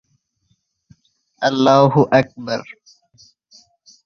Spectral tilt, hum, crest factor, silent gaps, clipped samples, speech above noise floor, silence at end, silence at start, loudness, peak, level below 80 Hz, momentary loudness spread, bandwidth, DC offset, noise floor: -6.5 dB/octave; none; 18 dB; none; under 0.1%; 51 dB; 1.35 s; 1.4 s; -16 LUFS; -2 dBFS; -60 dBFS; 13 LU; 7 kHz; under 0.1%; -66 dBFS